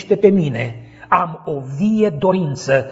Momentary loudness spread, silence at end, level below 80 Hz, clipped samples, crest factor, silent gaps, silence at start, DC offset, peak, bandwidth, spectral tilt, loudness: 12 LU; 0 s; -52 dBFS; under 0.1%; 16 dB; none; 0 s; under 0.1%; 0 dBFS; 8 kHz; -7 dB/octave; -18 LUFS